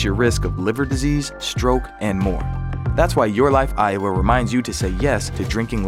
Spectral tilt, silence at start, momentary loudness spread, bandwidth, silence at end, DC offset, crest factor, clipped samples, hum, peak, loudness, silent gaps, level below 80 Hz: -6 dB/octave; 0 s; 7 LU; 15.5 kHz; 0 s; under 0.1%; 18 dB; under 0.1%; none; -2 dBFS; -20 LUFS; none; -28 dBFS